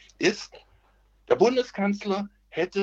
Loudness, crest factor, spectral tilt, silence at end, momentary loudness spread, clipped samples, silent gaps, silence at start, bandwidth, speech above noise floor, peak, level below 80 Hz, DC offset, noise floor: -26 LUFS; 20 dB; -5 dB/octave; 0 s; 14 LU; under 0.1%; none; 0.2 s; 8 kHz; 37 dB; -6 dBFS; -62 dBFS; under 0.1%; -62 dBFS